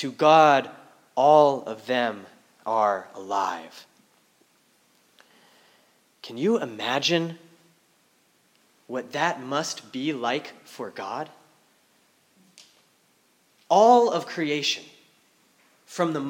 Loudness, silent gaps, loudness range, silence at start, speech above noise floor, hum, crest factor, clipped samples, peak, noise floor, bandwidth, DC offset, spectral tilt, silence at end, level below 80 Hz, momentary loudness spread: -23 LUFS; none; 11 LU; 0 s; 41 dB; none; 22 dB; under 0.1%; -4 dBFS; -64 dBFS; 16.5 kHz; under 0.1%; -4 dB/octave; 0 s; -86 dBFS; 21 LU